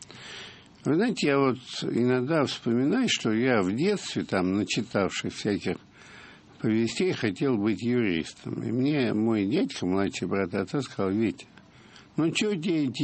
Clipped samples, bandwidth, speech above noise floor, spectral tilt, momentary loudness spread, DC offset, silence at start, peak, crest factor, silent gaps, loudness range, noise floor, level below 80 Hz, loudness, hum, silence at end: under 0.1%; 8.8 kHz; 26 dB; -5.5 dB/octave; 10 LU; under 0.1%; 0 s; -10 dBFS; 18 dB; none; 3 LU; -52 dBFS; -64 dBFS; -27 LUFS; none; 0 s